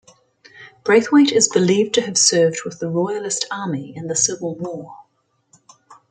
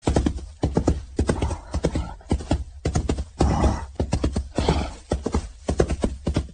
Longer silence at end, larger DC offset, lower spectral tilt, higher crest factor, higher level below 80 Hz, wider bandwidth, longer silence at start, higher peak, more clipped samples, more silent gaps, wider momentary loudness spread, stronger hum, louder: first, 0.15 s vs 0 s; neither; second, -3 dB/octave vs -6.5 dB/octave; about the same, 18 dB vs 22 dB; second, -66 dBFS vs -28 dBFS; about the same, 9.6 kHz vs 9.8 kHz; first, 0.55 s vs 0.05 s; about the same, -2 dBFS vs -2 dBFS; neither; neither; first, 14 LU vs 6 LU; neither; first, -18 LUFS vs -26 LUFS